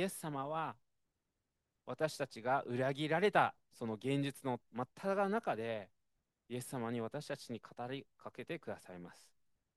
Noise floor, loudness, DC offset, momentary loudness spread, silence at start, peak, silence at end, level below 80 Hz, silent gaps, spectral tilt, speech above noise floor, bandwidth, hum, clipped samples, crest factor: -87 dBFS; -39 LUFS; under 0.1%; 15 LU; 0 s; -16 dBFS; 0.65 s; -82 dBFS; none; -5.5 dB/octave; 48 dB; 12.5 kHz; none; under 0.1%; 24 dB